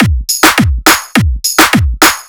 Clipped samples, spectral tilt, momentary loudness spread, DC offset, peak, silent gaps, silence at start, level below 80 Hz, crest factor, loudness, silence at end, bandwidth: 2%; -3 dB/octave; 4 LU; under 0.1%; 0 dBFS; none; 0 s; -18 dBFS; 10 dB; -8 LUFS; 0.05 s; over 20 kHz